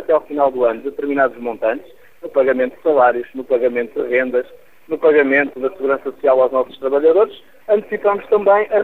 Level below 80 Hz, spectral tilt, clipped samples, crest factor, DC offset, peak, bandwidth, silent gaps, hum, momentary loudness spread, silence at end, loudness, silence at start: -58 dBFS; -7 dB/octave; under 0.1%; 14 dB; 0.6%; -2 dBFS; 15.5 kHz; none; none; 8 LU; 0 s; -17 LUFS; 0 s